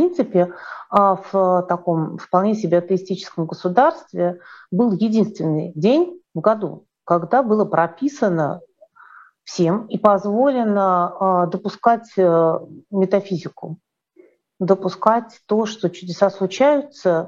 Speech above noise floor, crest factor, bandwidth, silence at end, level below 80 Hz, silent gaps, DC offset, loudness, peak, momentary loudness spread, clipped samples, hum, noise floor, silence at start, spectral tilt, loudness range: 35 dB; 18 dB; 7.6 kHz; 0 s; -68 dBFS; none; under 0.1%; -19 LUFS; 0 dBFS; 10 LU; under 0.1%; none; -53 dBFS; 0 s; -7.5 dB/octave; 3 LU